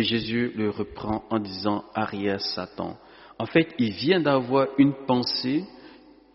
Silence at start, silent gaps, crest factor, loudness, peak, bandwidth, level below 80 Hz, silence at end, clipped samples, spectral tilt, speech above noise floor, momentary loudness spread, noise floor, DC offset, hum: 0 s; none; 20 dB; -25 LUFS; -6 dBFS; 6 kHz; -56 dBFS; 0.35 s; under 0.1%; -4 dB/octave; 25 dB; 12 LU; -50 dBFS; under 0.1%; none